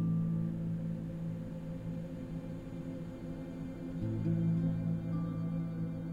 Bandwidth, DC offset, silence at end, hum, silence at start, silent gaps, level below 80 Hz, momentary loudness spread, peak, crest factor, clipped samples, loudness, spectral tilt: 4.8 kHz; under 0.1%; 0 s; none; 0 s; none; -54 dBFS; 10 LU; -22 dBFS; 14 dB; under 0.1%; -38 LUFS; -10 dB/octave